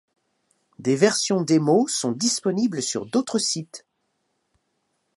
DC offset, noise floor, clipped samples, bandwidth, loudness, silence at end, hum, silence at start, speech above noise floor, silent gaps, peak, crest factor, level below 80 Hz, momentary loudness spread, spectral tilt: under 0.1%; -74 dBFS; under 0.1%; 11.5 kHz; -22 LUFS; 1.4 s; none; 0.8 s; 52 dB; none; -4 dBFS; 20 dB; -72 dBFS; 10 LU; -4 dB/octave